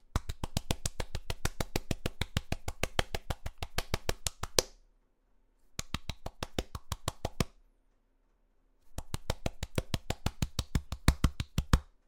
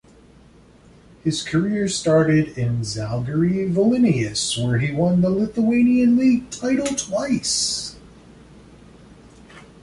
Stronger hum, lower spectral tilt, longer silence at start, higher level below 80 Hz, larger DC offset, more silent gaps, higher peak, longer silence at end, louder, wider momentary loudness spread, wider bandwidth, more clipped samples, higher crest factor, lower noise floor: neither; about the same, -4 dB/octave vs -5 dB/octave; second, 0.1 s vs 1.25 s; first, -40 dBFS vs -50 dBFS; neither; neither; about the same, -4 dBFS vs -6 dBFS; about the same, 0.2 s vs 0.2 s; second, -37 LUFS vs -20 LUFS; first, 11 LU vs 8 LU; first, 18 kHz vs 11.5 kHz; neither; first, 32 dB vs 14 dB; first, -71 dBFS vs -49 dBFS